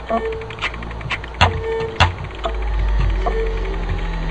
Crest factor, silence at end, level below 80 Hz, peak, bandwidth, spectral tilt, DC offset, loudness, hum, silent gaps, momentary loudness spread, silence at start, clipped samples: 20 dB; 0 s; -24 dBFS; 0 dBFS; 8.4 kHz; -5.5 dB/octave; under 0.1%; -22 LUFS; none; none; 8 LU; 0 s; under 0.1%